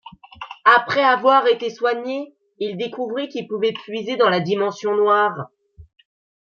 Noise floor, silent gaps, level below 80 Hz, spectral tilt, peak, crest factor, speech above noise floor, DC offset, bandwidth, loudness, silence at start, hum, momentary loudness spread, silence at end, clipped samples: -39 dBFS; none; -62 dBFS; -5 dB/octave; -2 dBFS; 18 dB; 20 dB; under 0.1%; 7.2 kHz; -19 LUFS; 0.05 s; none; 15 LU; 0.6 s; under 0.1%